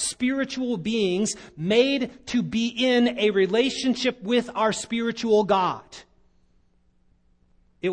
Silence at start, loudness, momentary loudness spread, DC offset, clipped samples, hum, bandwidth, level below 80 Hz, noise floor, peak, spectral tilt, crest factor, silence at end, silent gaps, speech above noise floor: 0 s; -23 LUFS; 7 LU; under 0.1%; under 0.1%; none; 10 kHz; -60 dBFS; -62 dBFS; -6 dBFS; -4 dB/octave; 18 dB; 0 s; none; 39 dB